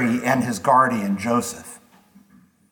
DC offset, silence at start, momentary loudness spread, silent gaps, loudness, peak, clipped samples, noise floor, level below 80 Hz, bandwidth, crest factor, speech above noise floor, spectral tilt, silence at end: under 0.1%; 0 s; 16 LU; none; -20 LUFS; -4 dBFS; under 0.1%; -54 dBFS; -64 dBFS; 18.5 kHz; 18 dB; 34 dB; -5 dB/octave; 0.95 s